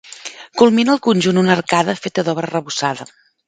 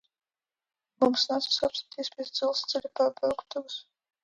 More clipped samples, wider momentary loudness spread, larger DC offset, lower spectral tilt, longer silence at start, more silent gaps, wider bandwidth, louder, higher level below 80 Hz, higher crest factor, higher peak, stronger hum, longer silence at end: neither; first, 15 LU vs 11 LU; neither; first, -5 dB/octave vs -3 dB/octave; second, 0.05 s vs 1 s; neither; second, 9.4 kHz vs 10.5 kHz; first, -16 LUFS vs -29 LUFS; first, -58 dBFS vs -70 dBFS; about the same, 16 dB vs 18 dB; first, 0 dBFS vs -12 dBFS; neither; about the same, 0.45 s vs 0.45 s